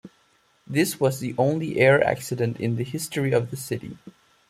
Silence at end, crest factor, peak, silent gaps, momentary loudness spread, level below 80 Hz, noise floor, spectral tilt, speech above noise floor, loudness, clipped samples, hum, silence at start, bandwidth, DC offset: 0.4 s; 20 dB; -4 dBFS; none; 12 LU; -60 dBFS; -63 dBFS; -5.5 dB/octave; 40 dB; -24 LUFS; under 0.1%; none; 0.05 s; 15.5 kHz; under 0.1%